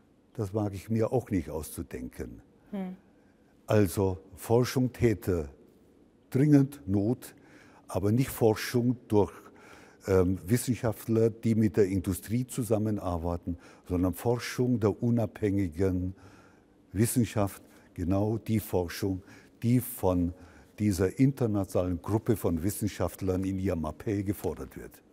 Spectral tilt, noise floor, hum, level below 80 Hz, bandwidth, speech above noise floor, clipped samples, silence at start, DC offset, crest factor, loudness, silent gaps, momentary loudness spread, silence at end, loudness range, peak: -7 dB/octave; -61 dBFS; none; -54 dBFS; 16 kHz; 33 dB; under 0.1%; 0.35 s; under 0.1%; 20 dB; -29 LUFS; none; 13 LU; 0.25 s; 3 LU; -8 dBFS